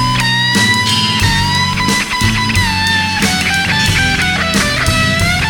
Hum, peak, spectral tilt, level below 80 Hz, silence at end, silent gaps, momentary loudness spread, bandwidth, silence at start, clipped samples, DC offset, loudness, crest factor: none; 0 dBFS; -3 dB/octave; -28 dBFS; 0 s; none; 2 LU; 19 kHz; 0 s; under 0.1%; under 0.1%; -12 LUFS; 12 dB